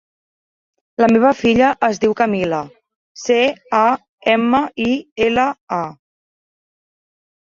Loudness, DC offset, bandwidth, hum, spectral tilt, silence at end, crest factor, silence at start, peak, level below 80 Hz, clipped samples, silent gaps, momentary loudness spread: -16 LUFS; under 0.1%; 7.6 kHz; none; -5 dB/octave; 1.55 s; 16 dB; 1 s; -2 dBFS; -52 dBFS; under 0.1%; 2.96-3.15 s, 4.09-4.18 s, 5.12-5.16 s, 5.61-5.67 s; 10 LU